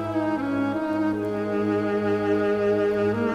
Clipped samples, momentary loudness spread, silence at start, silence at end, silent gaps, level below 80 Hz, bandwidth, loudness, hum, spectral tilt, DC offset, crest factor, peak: under 0.1%; 3 LU; 0 s; 0 s; none; -56 dBFS; 11.5 kHz; -24 LUFS; none; -8 dB/octave; under 0.1%; 12 dB; -12 dBFS